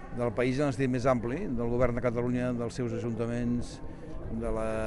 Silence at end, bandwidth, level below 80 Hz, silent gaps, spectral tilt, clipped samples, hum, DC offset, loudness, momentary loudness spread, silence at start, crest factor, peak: 0 s; 11.5 kHz; -42 dBFS; none; -7.5 dB/octave; under 0.1%; none; under 0.1%; -31 LUFS; 10 LU; 0 s; 18 dB; -12 dBFS